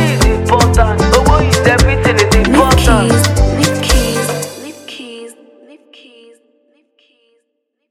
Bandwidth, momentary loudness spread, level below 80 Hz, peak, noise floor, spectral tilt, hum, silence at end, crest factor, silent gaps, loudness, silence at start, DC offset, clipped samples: 16.5 kHz; 19 LU; -18 dBFS; 0 dBFS; -69 dBFS; -5 dB/octave; none; 2.6 s; 12 dB; none; -11 LUFS; 0 s; under 0.1%; under 0.1%